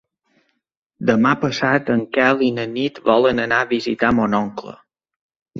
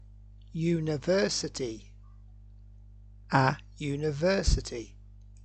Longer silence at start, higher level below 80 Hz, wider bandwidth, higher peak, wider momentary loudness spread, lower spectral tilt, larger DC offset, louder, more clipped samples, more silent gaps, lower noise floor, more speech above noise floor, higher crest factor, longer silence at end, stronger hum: first, 1 s vs 0 s; second, -52 dBFS vs -40 dBFS; second, 7.4 kHz vs 9 kHz; first, -2 dBFS vs -8 dBFS; second, 7 LU vs 14 LU; about the same, -6 dB/octave vs -5 dB/octave; neither; first, -18 LUFS vs -29 LUFS; neither; first, 5.16-5.29 s, 5.36-5.46 s vs none; first, -64 dBFS vs -51 dBFS; first, 46 dB vs 22 dB; about the same, 18 dB vs 22 dB; about the same, 0 s vs 0 s; second, none vs 50 Hz at -50 dBFS